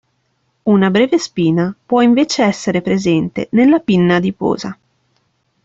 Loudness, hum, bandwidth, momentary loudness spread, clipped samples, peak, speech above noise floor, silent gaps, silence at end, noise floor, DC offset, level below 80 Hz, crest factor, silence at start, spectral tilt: -14 LUFS; none; 8 kHz; 7 LU; under 0.1%; -2 dBFS; 51 dB; none; 0.9 s; -64 dBFS; under 0.1%; -54 dBFS; 12 dB; 0.65 s; -6 dB/octave